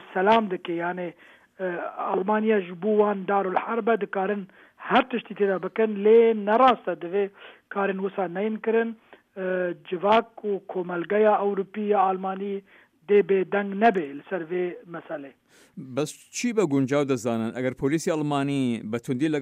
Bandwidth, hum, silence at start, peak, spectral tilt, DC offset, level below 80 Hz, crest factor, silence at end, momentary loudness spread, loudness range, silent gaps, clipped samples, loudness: 14.5 kHz; none; 0 s; -8 dBFS; -6 dB/octave; under 0.1%; -68 dBFS; 18 dB; 0 s; 12 LU; 5 LU; none; under 0.1%; -25 LUFS